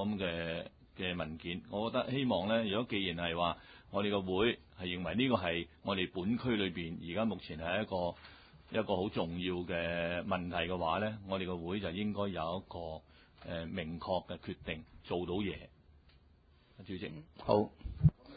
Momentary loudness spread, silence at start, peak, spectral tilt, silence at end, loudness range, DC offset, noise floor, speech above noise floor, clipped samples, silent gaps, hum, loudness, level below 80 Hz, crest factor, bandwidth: 12 LU; 0 s; -14 dBFS; -4.5 dB/octave; 0 s; 6 LU; under 0.1%; -65 dBFS; 29 dB; under 0.1%; none; none; -37 LUFS; -54 dBFS; 22 dB; 4.8 kHz